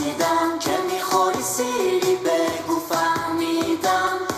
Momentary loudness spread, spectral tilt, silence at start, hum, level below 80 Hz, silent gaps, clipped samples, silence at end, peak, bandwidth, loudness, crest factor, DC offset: 3 LU; -3 dB/octave; 0 s; none; -60 dBFS; none; under 0.1%; 0 s; -6 dBFS; 16 kHz; -21 LUFS; 16 dB; under 0.1%